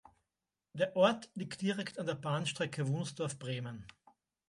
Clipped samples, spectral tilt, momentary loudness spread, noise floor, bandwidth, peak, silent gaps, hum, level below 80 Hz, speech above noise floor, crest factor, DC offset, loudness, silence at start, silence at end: under 0.1%; -5.5 dB/octave; 13 LU; under -90 dBFS; 11.5 kHz; -14 dBFS; none; none; -74 dBFS; over 55 dB; 22 dB; under 0.1%; -36 LUFS; 0.75 s; 0.6 s